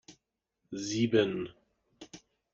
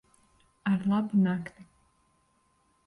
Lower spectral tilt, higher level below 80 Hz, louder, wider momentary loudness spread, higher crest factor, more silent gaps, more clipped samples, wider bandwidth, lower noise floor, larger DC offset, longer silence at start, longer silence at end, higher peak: second, -5 dB/octave vs -8.5 dB/octave; about the same, -70 dBFS vs -68 dBFS; second, -31 LUFS vs -28 LUFS; first, 24 LU vs 10 LU; first, 22 dB vs 16 dB; neither; neither; second, 7.8 kHz vs 11 kHz; first, -82 dBFS vs -70 dBFS; neither; second, 0.1 s vs 0.65 s; second, 0.35 s vs 1.25 s; first, -12 dBFS vs -16 dBFS